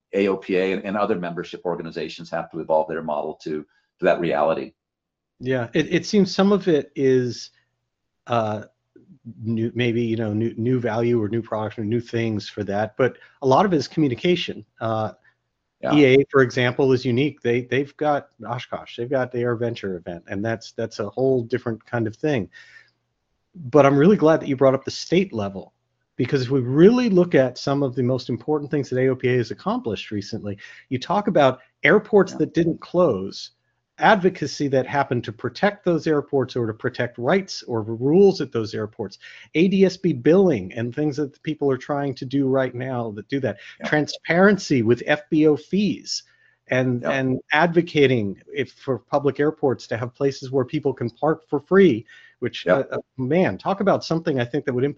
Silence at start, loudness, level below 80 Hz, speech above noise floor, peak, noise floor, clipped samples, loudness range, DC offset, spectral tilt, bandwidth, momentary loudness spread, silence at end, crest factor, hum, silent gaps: 0.15 s; -22 LUFS; -60 dBFS; 62 dB; 0 dBFS; -83 dBFS; under 0.1%; 5 LU; under 0.1%; -6.5 dB/octave; 7.6 kHz; 13 LU; 0.05 s; 20 dB; none; none